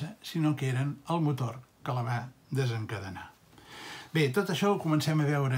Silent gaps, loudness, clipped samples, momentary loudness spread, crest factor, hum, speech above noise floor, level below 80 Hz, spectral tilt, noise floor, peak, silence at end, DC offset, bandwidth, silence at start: none; -31 LUFS; under 0.1%; 15 LU; 16 dB; none; 21 dB; -70 dBFS; -6.5 dB/octave; -51 dBFS; -14 dBFS; 0 s; under 0.1%; 16 kHz; 0 s